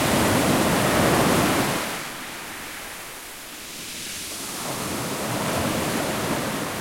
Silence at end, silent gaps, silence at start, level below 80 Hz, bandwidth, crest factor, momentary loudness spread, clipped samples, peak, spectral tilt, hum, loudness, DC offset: 0 s; none; 0 s; -46 dBFS; 16.5 kHz; 18 dB; 15 LU; under 0.1%; -8 dBFS; -4 dB/octave; none; -24 LUFS; under 0.1%